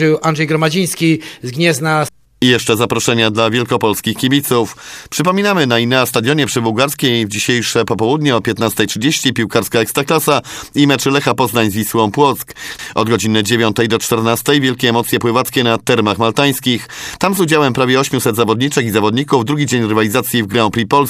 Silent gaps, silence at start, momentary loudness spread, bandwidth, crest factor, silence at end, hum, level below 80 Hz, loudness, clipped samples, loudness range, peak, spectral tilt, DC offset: none; 0 s; 4 LU; 16 kHz; 14 dB; 0 s; none; -50 dBFS; -14 LUFS; under 0.1%; 1 LU; 0 dBFS; -4.5 dB/octave; under 0.1%